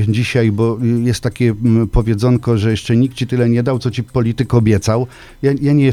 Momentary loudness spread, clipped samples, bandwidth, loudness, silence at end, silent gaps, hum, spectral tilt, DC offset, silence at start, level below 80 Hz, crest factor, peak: 5 LU; under 0.1%; 12.5 kHz; -15 LUFS; 0 s; none; none; -7.5 dB/octave; under 0.1%; 0 s; -30 dBFS; 14 dB; 0 dBFS